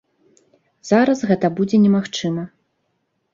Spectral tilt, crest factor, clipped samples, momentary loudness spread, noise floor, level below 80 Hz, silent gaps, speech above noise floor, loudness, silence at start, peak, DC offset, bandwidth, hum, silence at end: -6.5 dB/octave; 18 dB; under 0.1%; 14 LU; -70 dBFS; -60 dBFS; none; 53 dB; -18 LUFS; 0.85 s; -2 dBFS; under 0.1%; 7.6 kHz; none; 0.85 s